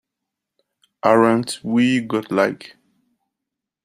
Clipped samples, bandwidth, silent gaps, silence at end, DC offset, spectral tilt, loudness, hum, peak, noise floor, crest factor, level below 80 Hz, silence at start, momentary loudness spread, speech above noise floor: under 0.1%; 14.5 kHz; none; 1.2 s; under 0.1%; -5.5 dB/octave; -18 LUFS; none; -2 dBFS; -83 dBFS; 20 dB; -66 dBFS; 1.05 s; 7 LU; 66 dB